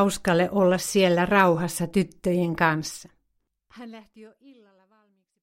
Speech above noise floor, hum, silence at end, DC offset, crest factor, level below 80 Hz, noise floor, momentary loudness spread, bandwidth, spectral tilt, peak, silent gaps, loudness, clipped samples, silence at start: 51 dB; none; 1.15 s; under 0.1%; 20 dB; -54 dBFS; -75 dBFS; 23 LU; 16.5 kHz; -5 dB/octave; -6 dBFS; none; -22 LUFS; under 0.1%; 0 s